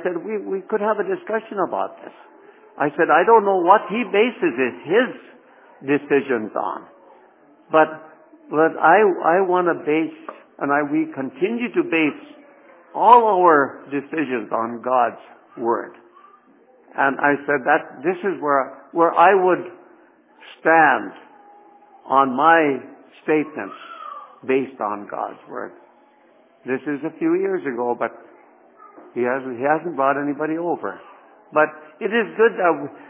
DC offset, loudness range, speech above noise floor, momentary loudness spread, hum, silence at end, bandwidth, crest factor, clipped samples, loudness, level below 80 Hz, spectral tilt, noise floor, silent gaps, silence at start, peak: under 0.1%; 8 LU; 35 dB; 17 LU; none; 0.1 s; 3.9 kHz; 20 dB; under 0.1%; -19 LUFS; -76 dBFS; -9 dB/octave; -54 dBFS; none; 0 s; 0 dBFS